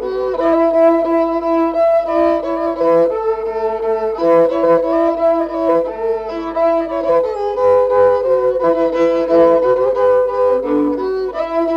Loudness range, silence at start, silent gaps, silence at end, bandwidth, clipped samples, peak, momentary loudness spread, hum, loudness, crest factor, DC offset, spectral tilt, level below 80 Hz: 2 LU; 0 s; none; 0 s; 6.6 kHz; under 0.1%; -2 dBFS; 7 LU; none; -15 LUFS; 12 dB; under 0.1%; -7 dB/octave; -46 dBFS